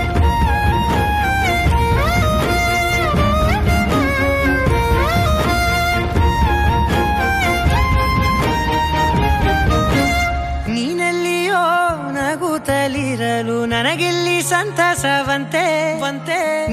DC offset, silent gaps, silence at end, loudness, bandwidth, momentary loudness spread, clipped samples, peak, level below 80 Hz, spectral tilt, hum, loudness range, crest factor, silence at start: under 0.1%; none; 0 s; -16 LUFS; 15.5 kHz; 4 LU; under 0.1%; -4 dBFS; -22 dBFS; -5 dB/octave; none; 2 LU; 12 dB; 0 s